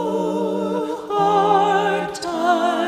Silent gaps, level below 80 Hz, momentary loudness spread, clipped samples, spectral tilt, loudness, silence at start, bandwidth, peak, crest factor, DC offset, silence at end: none; -60 dBFS; 8 LU; under 0.1%; -5 dB/octave; -19 LUFS; 0 s; 15.5 kHz; -6 dBFS; 14 dB; under 0.1%; 0 s